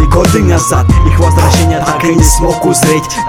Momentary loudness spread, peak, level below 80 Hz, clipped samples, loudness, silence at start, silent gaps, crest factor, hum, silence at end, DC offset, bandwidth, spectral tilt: 2 LU; 0 dBFS; -14 dBFS; 2%; -9 LUFS; 0 s; none; 8 dB; none; 0 s; under 0.1%; 16.5 kHz; -5 dB/octave